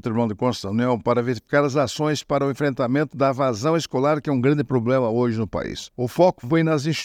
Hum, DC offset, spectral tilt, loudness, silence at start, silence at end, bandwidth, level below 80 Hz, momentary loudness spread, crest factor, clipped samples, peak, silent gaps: none; under 0.1%; -6.5 dB/octave; -22 LUFS; 0.05 s; 0 s; 16 kHz; -54 dBFS; 5 LU; 16 dB; under 0.1%; -4 dBFS; none